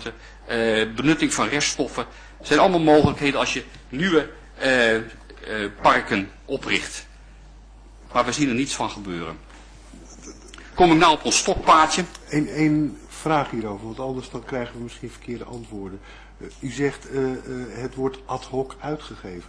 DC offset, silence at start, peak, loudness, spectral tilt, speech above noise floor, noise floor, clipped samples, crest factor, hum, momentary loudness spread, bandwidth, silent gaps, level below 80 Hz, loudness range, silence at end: under 0.1%; 0 s; -4 dBFS; -22 LUFS; -4 dB/octave; 23 dB; -45 dBFS; under 0.1%; 18 dB; none; 20 LU; 11 kHz; none; -44 dBFS; 11 LU; 0 s